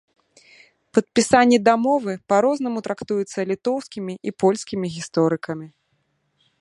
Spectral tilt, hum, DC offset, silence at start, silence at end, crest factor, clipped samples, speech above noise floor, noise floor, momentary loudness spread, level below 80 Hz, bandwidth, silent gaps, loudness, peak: -5 dB/octave; none; under 0.1%; 0.95 s; 0.95 s; 20 dB; under 0.1%; 49 dB; -69 dBFS; 12 LU; -62 dBFS; 11.5 kHz; none; -21 LUFS; -2 dBFS